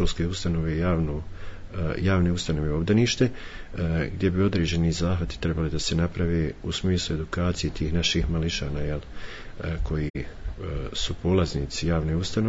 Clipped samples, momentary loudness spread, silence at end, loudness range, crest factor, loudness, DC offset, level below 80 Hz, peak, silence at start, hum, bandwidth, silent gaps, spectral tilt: under 0.1%; 12 LU; 0 s; 4 LU; 16 dB; -26 LUFS; under 0.1%; -36 dBFS; -8 dBFS; 0 s; none; 8 kHz; 10.10-10.14 s; -5.5 dB/octave